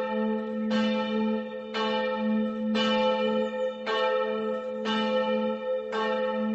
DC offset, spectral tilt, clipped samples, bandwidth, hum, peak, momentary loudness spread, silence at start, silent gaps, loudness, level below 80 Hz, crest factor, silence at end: under 0.1%; -3 dB/octave; under 0.1%; 8 kHz; none; -14 dBFS; 5 LU; 0 s; none; -28 LUFS; -68 dBFS; 14 dB; 0 s